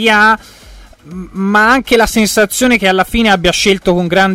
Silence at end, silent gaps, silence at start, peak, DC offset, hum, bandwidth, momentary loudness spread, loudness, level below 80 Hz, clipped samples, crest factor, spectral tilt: 0 s; none; 0 s; 0 dBFS; under 0.1%; none; 16 kHz; 9 LU; -10 LUFS; -32 dBFS; under 0.1%; 12 dB; -3.5 dB/octave